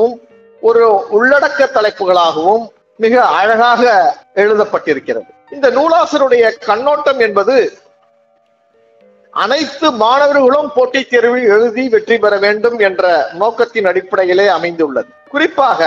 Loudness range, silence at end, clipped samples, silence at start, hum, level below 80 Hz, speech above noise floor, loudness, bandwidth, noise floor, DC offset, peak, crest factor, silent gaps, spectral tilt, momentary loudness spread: 3 LU; 0 s; under 0.1%; 0 s; none; -60 dBFS; 44 dB; -11 LUFS; 7.6 kHz; -55 dBFS; under 0.1%; 0 dBFS; 12 dB; none; -4 dB/octave; 7 LU